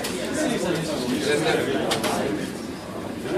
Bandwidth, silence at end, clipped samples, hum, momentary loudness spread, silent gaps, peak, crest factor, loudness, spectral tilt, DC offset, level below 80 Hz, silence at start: 15.5 kHz; 0 s; under 0.1%; none; 11 LU; none; -10 dBFS; 16 dB; -25 LUFS; -4 dB/octave; under 0.1%; -52 dBFS; 0 s